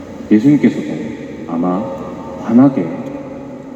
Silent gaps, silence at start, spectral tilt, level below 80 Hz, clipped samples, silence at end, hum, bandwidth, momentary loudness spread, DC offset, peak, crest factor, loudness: none; 0 s; -8.5 dB/octave; -50 dBFS; under 0.1%; 0 s; none; 8 kHz; 16 LU; under 0.1%; 0 dBFS; 16 dB; -15 LUFS